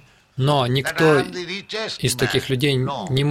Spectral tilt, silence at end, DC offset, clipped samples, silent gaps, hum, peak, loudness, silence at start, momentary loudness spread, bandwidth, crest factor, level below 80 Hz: -5 dB/octave; 0 s; under 0.1%; under 0.1%; none; none; -4 dBFS; -20 LUFS; 0.35 s; 10 LU; 16.5 kHz; 16 dB; -50 dBFS